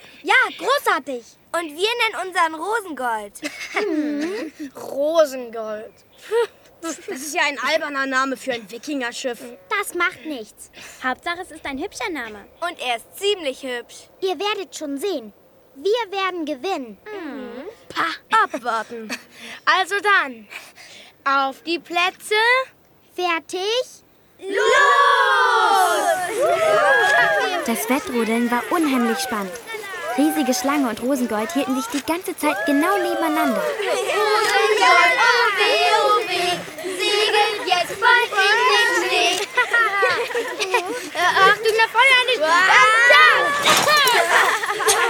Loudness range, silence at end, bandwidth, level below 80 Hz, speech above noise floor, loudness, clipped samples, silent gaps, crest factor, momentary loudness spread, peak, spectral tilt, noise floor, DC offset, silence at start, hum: 10 LU; 0 s; 19 kHz; -64 dBFS; 24 dB; -18 LUFS; under 0.1%; none; 18 dB; 16 LU; -2 dBFS; -1.5 dB/octave; -44 dBFS; under 0.1%; 0.05 s; none